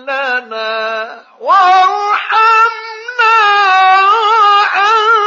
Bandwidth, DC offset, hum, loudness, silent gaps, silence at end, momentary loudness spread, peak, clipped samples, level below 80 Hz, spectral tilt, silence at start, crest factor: 7.4 kHz; under 0.1%; none; -9 LUFS; none; 0 s; 12 LU; 0 dBFS; under 0.1%; -74 dBFS; 0.5 dB/octave; 0.05 s; 10 dB